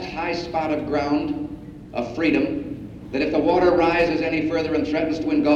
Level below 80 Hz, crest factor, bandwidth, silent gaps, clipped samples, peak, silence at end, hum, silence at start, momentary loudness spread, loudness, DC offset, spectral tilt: -46 dBFS; 16 dB; 7.4 kHz; none; under 0.1%; -6 dBFS; 0 s; none; 0 s; 12 LU; -22 LUFS; under 0.1%; -6.5 dB/octave